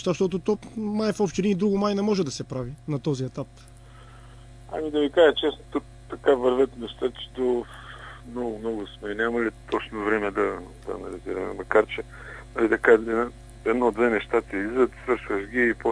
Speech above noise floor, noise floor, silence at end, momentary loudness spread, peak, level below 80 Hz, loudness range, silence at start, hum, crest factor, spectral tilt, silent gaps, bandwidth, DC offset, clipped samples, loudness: 22 dB; -46 dBFS; 0 s; 14 LU; -4 dBFS; -48 dBFS; 5 LU; 0 s; none; 20 dB; -6 dB/octave; none; 11 kHz; under 0.1%; under 0.1%; -25 LUFS